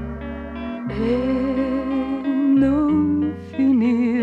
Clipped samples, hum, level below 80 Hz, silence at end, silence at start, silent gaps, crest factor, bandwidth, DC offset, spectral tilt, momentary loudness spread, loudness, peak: under 0.1%; none; -40 dBFS; 0 s; 0 s; none; 12 dB; 5.6 kHz; under 0.1%; -9 dB/octave; 13 LU; -20 LUFS; -8 dBFS